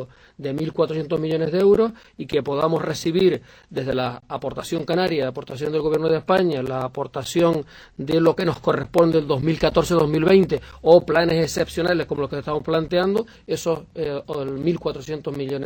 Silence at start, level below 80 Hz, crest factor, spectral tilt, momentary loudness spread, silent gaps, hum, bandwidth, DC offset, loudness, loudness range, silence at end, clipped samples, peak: 0 s; -48 dBFS; 20 dB; -6 dB/octave; 12 LU; none; none; 19 kHz; under 0.1%; -21 LUFS; 5 LU; 0 s; under 0.1%; -2 dBFS